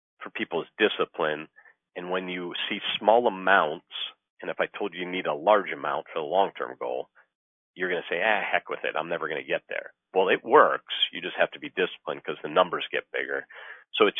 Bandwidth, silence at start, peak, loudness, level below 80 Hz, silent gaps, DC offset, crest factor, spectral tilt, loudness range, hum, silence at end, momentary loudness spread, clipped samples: 3.9 kHz; 0.2 s; -2 dBFS; -27 LUFS; -78 dBFS; 4.30-4.37 s, 7.35-7.74 s; under 0.1%; 24 dB; -6.5 dB/octave; 4 LU; none; 0 s; 13 LU; under 0.1%